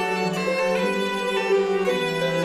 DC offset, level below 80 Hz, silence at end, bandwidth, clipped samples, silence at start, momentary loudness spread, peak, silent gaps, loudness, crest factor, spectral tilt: under 0.1%; -62 dBFS; 0 s; 14.5 kHz; under 0.1%; 0 s; 2 LU; -10 dBFS; none; -23 LUFS; 12 dB; -5 dB/octave